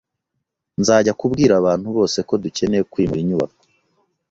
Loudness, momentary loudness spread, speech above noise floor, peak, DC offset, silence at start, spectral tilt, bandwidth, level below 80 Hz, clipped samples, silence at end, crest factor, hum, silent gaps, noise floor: -18 LUFS; 7 LU; 60 dB; -2 dBFS; under 0.1%; 0.8 s; -5.5 dB/octave; 8 kHz; -48 dBFS; under 0.1%; 0.85 s; 18 dB; none; none; -77 dBFS